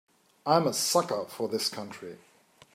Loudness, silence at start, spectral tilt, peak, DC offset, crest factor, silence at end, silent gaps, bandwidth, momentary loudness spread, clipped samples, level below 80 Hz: -28 LUFS; 0.45 s; -3.5 dB/octave; -8 dBFS; under 0.1%; 22 dB; 0.6 s; none; 16 kHz; 17 LU; under 0.1%; -78 dBFS